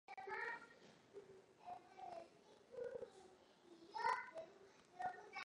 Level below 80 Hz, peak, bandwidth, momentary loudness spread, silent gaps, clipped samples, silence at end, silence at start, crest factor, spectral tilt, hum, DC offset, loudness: -88 dBFS; -28 dBFS; 11 kHz; 22 LU; none; under 0.1%; 0 s; 0.1 s; 24 dB; -3 dB/octave; none; under 0.1%; -50 LUFS